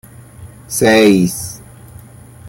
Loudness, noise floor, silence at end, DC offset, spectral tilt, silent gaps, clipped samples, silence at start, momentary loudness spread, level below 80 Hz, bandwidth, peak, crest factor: -12 LUFS; -37 dBFS; 0 s; under 0.1%; -4.5 dB/octave; none; under 0.1%; 0.4 s; 18 LU; -46 dBFS; 17 kHz; -2 dBFS; 14 dB